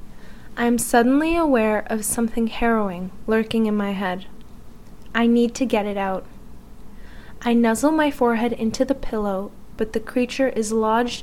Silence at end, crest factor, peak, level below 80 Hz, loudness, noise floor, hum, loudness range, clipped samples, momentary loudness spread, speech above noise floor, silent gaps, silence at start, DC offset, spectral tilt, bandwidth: 0 s; 18 dB; -4 dBFS; -40 dBFS; -21 LUFS; -41 dBFS; none; 4 LU; under 0.1%; 9 LU; 21 dB; none; 0 s; 1%; -4.5 dB/octave; 16 kHz